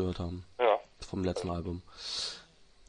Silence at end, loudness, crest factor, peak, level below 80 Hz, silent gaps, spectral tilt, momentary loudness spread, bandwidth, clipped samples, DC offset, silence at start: 0.05 s; -34 LUFS; 22 dB; -14 dBFS; -56 dBFS; none; -5 dB/octave; 12 LU; 10.5 kHz; under 0.1%; under 0.1%; 0 s